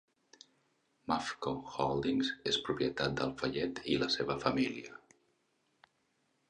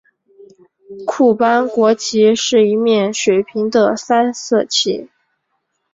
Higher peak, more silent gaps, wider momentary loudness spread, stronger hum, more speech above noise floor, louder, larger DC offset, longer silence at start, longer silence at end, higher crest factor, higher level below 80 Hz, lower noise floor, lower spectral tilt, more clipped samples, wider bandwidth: second, -14 dBFS vs -2 dBFS; neither; about the same, 6 LU vs 5 LU; neither; second, 43 dB vs 55 dB; second, -34 LUFS vs -14 LUFS; neither; first, 1.1 s vs 0.9 s; first, 1.55 s vs 0.85 s; first, 22 dB vs 14 dB; about the same, -64 dBFS vs -60 dBFS; first, -77 dBFS vs -69 dBFS; about the same, -4.5 dB/octave vs -3.5 dB/octave; neither; first, 10 kHz vs 7.8 kHz